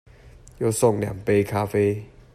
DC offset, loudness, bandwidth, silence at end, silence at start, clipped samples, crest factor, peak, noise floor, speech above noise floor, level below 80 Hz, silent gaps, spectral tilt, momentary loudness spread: under 0.1%; -23 LUFS; 15 kHz; 0.3 s; 0.25 s; under 0.1%; 18 dB; -6 dBFS; -47 dBFS; 26 dB; -50 dBFS; none; -6 dB/octave; 6 LU